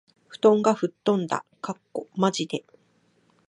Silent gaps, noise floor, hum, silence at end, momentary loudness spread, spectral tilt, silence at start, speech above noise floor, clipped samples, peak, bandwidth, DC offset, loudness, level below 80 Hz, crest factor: none; -65 dBFS; none; 0.9 s; 15 LU; -5.5 dB/octave; 0.3 s; 41 dB; under 0.1%; -6 dBFS; 10.5 kHz; under 0.1%; -25 LUFS; -76 dBFS; 20 dB